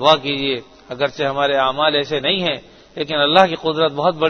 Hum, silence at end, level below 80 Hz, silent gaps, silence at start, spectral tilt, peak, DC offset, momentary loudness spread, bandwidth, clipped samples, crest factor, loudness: none; 0 s; -56 dBFS; none; 0 s; -5 dB/octave; 0 dBFS; under 0.1%; 13 LU; 6.6 kHz; under 0.1%; 18 dB; -17 LUFS